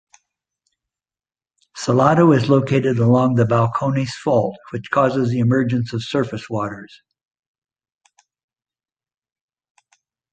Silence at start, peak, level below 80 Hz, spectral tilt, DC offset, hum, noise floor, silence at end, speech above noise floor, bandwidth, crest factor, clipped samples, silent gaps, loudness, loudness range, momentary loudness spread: 1.75 s; -2 dBFS; -56 dBFS; -7.5 dB/octave; under 0.1%; none; under -90 dBFS; 3.45 s; over 73 dB; 9 kHz; 18 dB; under 0.1%; none; -18 LUFS; 12 LU; 12 LU